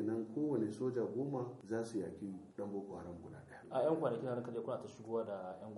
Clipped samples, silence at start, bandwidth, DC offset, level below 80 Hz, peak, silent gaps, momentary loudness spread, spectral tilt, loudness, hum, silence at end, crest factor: under 0.1%; 0 s; 11.5 kHz; under 0.1%; -76 dBFS; -22 dBFS; none; 12 LU; -8 dB/octave; -41 LUFS; none; 0 s; 18 dB